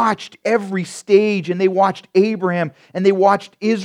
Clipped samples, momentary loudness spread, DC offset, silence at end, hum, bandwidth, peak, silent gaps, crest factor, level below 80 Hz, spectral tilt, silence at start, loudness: under 0.1%; 8 LU; under 0.1%; 0 s; none; 11 kHz; 0 dBFS; none; 16 dB; -72 dBFS; -6 dB/octave; 0 s; -17 LUFS